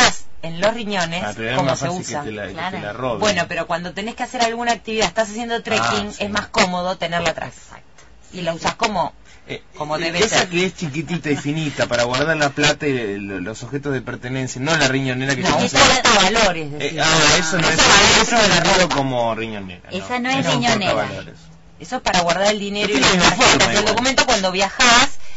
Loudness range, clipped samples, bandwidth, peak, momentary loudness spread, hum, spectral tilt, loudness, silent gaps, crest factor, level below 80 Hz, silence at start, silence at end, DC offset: 8 LU; under 0.1%; 8.2 kHz; 0 dBFS; 14 LU; none; -3 dB/octave; -17 LUFS; none; 18 dB; -40 dBFS; 0 s; 0 s; under 0.1%